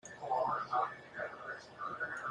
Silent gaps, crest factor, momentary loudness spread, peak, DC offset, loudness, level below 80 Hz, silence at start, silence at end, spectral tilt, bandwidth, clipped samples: none; 18 dB; 9 LU; -22 dBFS; under 0.1%; -39 LUFS; -78 dBFS; 0.05 s; 0 s; -4 dB/octave; 10.5 kHz; under 0.1%